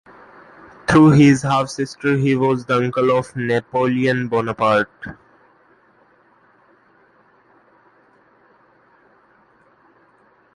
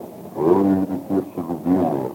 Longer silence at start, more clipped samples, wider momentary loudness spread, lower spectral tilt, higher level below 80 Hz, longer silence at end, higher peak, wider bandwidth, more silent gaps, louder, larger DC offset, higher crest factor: first, 0.9 s vs 0 s; neither; first, 12 LU vs 9 LU; second, -7 dB/octave vs -9 dB/octave; first, -52 dBFS vs -62 dBFS; first, 5.4 s vs 0 s; about the same, -2 dBFS vs -4 dBFS; second, 11.5 kHz vs 17 kHz; neither; first, -17 LUFS vs -21 LUFS; neither; about the same, 18 dB vs 16 dB